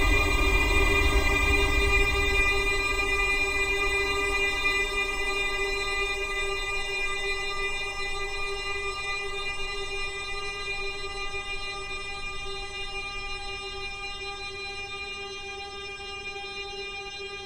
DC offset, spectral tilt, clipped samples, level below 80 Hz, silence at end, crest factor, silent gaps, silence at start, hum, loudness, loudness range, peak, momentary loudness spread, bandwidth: under 0.1%; -3 dB/octave; under 0.1%; -34 dBFS; 0 s; 18 dB; none; 0 s; none; -27 LUFS; 11 LU; -10 dBFS; 12 LU; 16 kHz